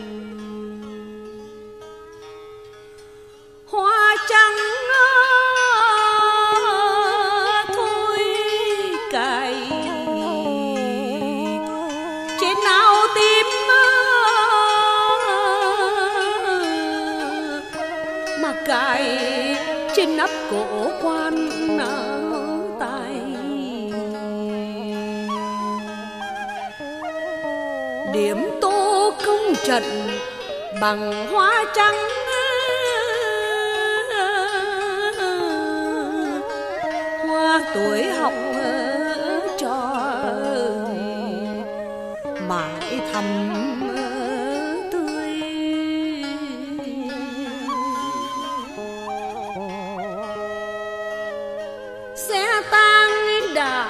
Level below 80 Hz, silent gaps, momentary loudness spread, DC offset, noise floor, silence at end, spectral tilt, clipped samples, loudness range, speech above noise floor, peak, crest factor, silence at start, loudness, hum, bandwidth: -58 dBFS; none; 15 LU; under 0.1%; -44 dBFS; 0 s; -3 dB/octave; under 0.1%; 12 LU; 25 dB; -2 dBFS; 20 dB; 0 s; -20 LUFS; none; 14 kHz